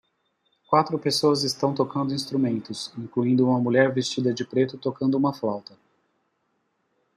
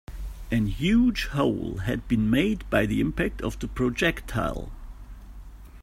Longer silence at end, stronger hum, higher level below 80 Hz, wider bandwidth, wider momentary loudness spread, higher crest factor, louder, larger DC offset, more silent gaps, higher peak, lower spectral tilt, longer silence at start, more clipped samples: first, 1.55 s vs 0 s; neither; second, -70 dBFS vs -38 dBFS; second, 13 kHz vs 16 kHz; second, 9 LU vs 20 LU; about the same, 20 dB vs 20 dB; about the same, -24 LUFS vs -26 LUFS; neither; neither; about the same, -4 dBFS vs -6 dBFS; about the same, -5.5 dB/octave vs -6.5 dB/octave; first, 0.7 s vs 0.1 s; neither